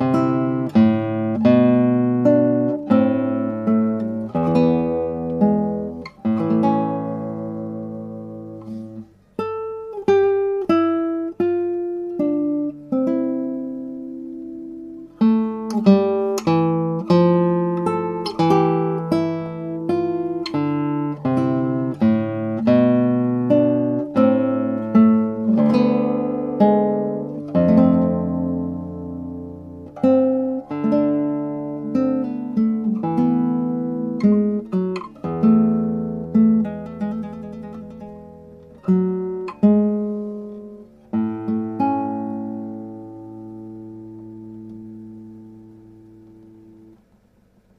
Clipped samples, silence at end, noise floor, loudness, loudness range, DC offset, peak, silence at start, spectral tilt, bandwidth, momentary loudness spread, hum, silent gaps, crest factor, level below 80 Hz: under 0.1%; 2 s; -57 dBFS; -20 LUFS; 9 LU; under 0.1%; -2 dBFS; 0 s; -9 dB/octave; 7.2 kHz; 18 LU; none; none; 18 dB; -56 dBFS